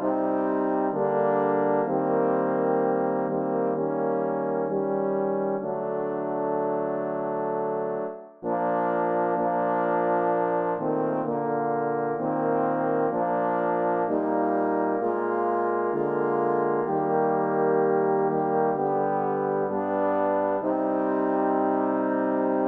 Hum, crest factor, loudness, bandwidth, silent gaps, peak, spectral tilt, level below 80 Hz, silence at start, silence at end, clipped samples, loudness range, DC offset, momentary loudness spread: none; 14 dB; -25 LUFS; 3.7 kHz; none; -10 dBFS; -11 dB/octave; -76 dBFS; 0 s; 0 s; under 0.1%; 3 LU; under 0.1%; 4 LU